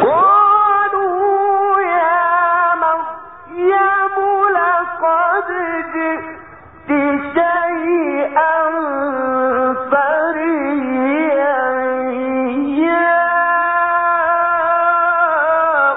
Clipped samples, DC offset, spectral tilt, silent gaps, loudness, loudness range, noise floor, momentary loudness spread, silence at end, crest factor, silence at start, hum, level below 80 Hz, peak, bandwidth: under 0.1%; 0.3%; -9.5 dB/octave; none; -15 LUFS; 3 LU; -38 dBFS; 6 LU; 0 s; 12 dB; 0 s; none; -56 dBFS; -2 dBFS; 4 kHz